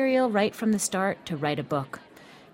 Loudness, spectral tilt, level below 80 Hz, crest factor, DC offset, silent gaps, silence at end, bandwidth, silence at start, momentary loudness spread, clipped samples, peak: -27 LUFS; -4.5 dB/octave; -66 dBFS; 18 dB; under 0.1%; none; 0.15 s; 16.5 kHz; 0 s; 9 LU; under 0.1%; -10 dBFS